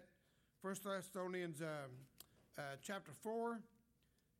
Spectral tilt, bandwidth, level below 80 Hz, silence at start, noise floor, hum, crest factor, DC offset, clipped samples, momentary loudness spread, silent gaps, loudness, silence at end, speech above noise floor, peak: -5 dB/octave; 16.5 kHz; -86 dBFS; 0 s; -79 dBFS; none; 16 dB; under 0.1%; under 0.1%; 14 LU; none; -48 LUFS; 0.75 s; 32 dB; -34 dBFS